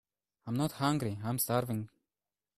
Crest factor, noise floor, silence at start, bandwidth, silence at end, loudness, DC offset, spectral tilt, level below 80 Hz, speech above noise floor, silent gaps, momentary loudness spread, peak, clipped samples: 20 dB; under -90 dBFS; 0.45 s; 15.5 kHz; 0.7 s; -34 LUFS; under 0.1%; -5.5 dB/octave; -66 dBFS; over 57 dB; none; 11 LU; -16 dBFS; under 0.1%